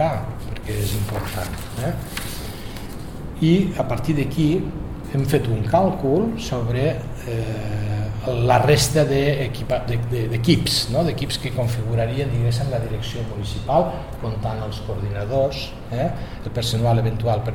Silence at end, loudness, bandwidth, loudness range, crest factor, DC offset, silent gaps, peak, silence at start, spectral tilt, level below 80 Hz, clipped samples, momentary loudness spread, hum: 0 s; -22 LUFS; 17 kHz; 5 LU; 20 dB; 0.4%; none; -2 dBFS; 0 s; -6 dB/octave; -36 dBFS; under 0.1%; 11 LU; none